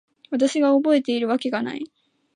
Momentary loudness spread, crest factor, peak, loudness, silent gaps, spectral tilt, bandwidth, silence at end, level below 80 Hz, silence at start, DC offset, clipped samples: 13 LU; 14 dB; -8 dBFS; -21 LUFS; none; -4.5 dB/octave; 10 kHz; 0.5 s; -76 dBFS; 0.3 s; under 0.1%; under 0.1%